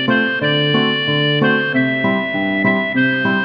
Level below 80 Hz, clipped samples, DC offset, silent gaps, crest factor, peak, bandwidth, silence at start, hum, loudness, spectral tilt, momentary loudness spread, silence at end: -58 dBFS; under 0.1%; under 0.1%; none; 14 dB; -2 dBFS; 5.6 kHz; 0 s; none; -15 LUFS; -8 dB/octave; 3 LU; 0 s